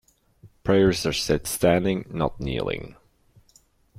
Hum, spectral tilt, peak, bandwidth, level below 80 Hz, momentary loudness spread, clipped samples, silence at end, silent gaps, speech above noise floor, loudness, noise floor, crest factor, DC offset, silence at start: none; -5 dB/octave; -6 dBFS; 16 kHz; -44 dBFS; 12 LU; under 0.1%; 1.05 s; none; 37 dB; -24 LUFS; -60 dBFS; 18 dB; under 0.1%; 0.45 s